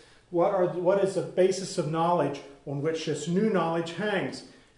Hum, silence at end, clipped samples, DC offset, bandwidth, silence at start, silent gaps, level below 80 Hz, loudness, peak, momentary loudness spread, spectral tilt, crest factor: none; 0.3 s; under 0.1%; under 0.1%; 11 kHz; 0.3 s; none; -66 dBFS; -27 LUFS; -12 dBFS; 8 LU; -6 dB/octave; 16 dB